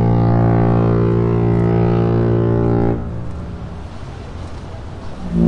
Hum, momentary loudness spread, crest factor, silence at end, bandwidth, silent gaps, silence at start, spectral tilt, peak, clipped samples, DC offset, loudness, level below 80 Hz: none; 17 LU; 14 dB; 0 s; 5.6 kHz; none; 0 s; -10.5 dB/octave; -2 dBFS; under 0.1%; under 0.1%; -16 LUFS; -30 dBFS